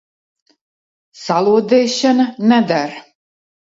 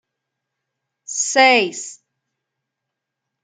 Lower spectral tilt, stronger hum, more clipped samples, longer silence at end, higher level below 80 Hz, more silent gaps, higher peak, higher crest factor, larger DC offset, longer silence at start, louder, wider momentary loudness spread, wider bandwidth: first, -5 dB/octave vs -0.5 dB/octave; neither; neither; second, 0.75 s vs 1.5 s; first, -66 dBFS vs -78 dBFS; neither; about the same, -2 dBFS vs -2 dBFS; about the same, 16 dB vs 20 dB; neither; about the same, 1.2 s vs 1.1 s; about the same, -15 LUFS vs -15 LUFS; second, 13 LU vs 19 LU; second, 7.8 kHz vs 10 kHz